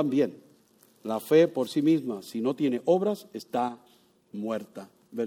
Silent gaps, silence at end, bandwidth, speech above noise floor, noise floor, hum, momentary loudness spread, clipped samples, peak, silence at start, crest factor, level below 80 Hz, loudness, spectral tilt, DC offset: none; 0 s; 18 kHz; 35 dB; -61 dBFS; none; 18 LU; under 0.1%; -10 dBFS; 0 s; 18 dB; -78 dBFS; -27 LUFS; -6.5 dB/octave; under 0.1%